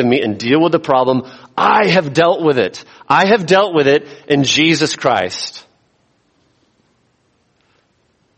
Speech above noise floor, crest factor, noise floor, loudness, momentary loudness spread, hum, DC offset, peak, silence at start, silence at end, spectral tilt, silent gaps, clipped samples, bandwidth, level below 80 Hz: 47 dB; 16 dB; -60 dBFS; -14 LUFS; 9 LU; none; under 0.1%; 0 dBFS; 0 s; 2.8 s; -4.5 dB/octave; none; under 0.1%; 8.8 kHz; -58 dBFS